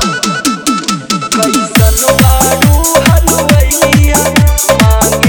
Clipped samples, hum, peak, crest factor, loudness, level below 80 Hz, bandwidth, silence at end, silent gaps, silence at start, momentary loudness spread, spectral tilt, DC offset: 1%; none; 0 dBFS; 8 dB; -8 LUFS; -14 dBFS; over 20 kHz; 0 s; none; 0 s; 5 LU; -4 dB/octave; under 0.1%